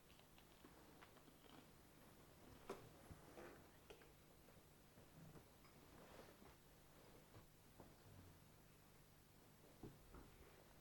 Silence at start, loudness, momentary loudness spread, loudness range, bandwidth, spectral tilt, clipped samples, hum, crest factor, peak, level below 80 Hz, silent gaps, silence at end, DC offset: 0 s; -66 LUFS; 7 LU; 3 LU; 18 kHz; -4.5 dB/octave; under 0.1%; none; 24 dB; -40 dBFS; -76 dBFS; none; 0 s; under 0.1%